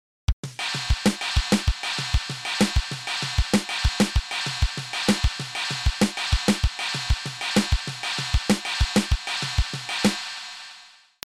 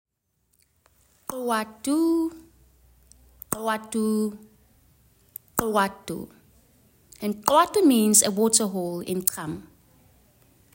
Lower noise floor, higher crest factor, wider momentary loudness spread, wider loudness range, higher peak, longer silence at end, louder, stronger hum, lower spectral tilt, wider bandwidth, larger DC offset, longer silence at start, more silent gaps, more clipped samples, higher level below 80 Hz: second, -50 dBFS vs -72 dBFS; second, 16 dB vs 24 dB; second, 6 LU vs 18 LU; second, 1 LU vs 9 LU; second, -8 dBFS vs -2 dBFS; second, 0.45 s vs 1.1 s; about the same, -25 LUFS vs -23 LUFS; neither; about the same, -4 dB/octave vs -3.5 dB/octave; about the same, 16 kHz vs 16.5 kHz; neither; second, 0.3 s vs 1.3 s; first, 0.33-0.43 s vs none; neither; first, -30 dBFS vs -60 dBFS